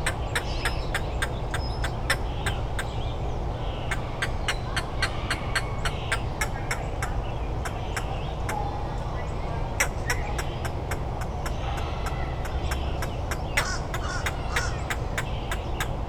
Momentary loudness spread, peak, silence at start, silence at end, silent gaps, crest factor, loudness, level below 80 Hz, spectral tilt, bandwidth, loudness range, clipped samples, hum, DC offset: 5 LU; -8 dBFS; 0 s; 0 s; none; 20 dB; -30 LUFS; -32 dBFS; -4.5 dB/octave; 19 kHz; 2 LU; under 0.1%; none; under 0.1%